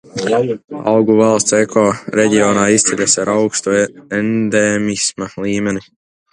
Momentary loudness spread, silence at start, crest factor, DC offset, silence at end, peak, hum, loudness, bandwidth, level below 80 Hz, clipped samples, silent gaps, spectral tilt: 8 LU; 0.15 s; 14 dB; under 0.1%; 0.5 s; 0 dBFS; none; -14 LUFS; 11 kHz; -52 dBFS; under 0.1%; none; -4 dB/octave